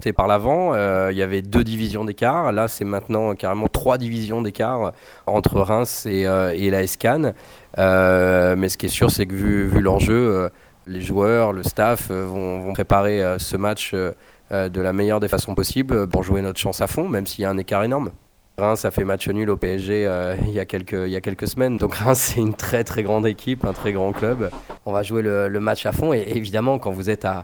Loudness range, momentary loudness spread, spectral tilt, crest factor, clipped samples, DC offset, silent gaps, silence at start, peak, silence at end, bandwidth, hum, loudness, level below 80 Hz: 4 LU; 8 LU; -5.5 dB/octave; 20 dB; under 0.1%; under 0.1%; none; 0 s; 0 dBFS; 0 s; over 20 kHz; none; -21 LUFS; -36 dBFS